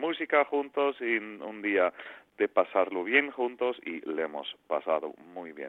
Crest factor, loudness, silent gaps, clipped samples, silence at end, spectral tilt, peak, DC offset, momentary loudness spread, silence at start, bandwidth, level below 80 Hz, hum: 22 dB; -29 LUFS; none; under 0.1%; 0 s; -6 dB/octave; -8 dBFS; under 0.1%; 15 LU; 0 s; 4.1 kHz; -78 dBFS; none